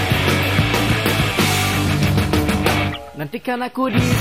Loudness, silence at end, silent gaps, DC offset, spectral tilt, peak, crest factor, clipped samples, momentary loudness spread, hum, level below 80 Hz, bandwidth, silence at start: -18 LUFS; 0 s; none; 0.4%; -5 dB/octave; -4 dBFS; 14 dB; under 0.1%; 8 LU; none; -34 dBFS; 16 kHz; 0 s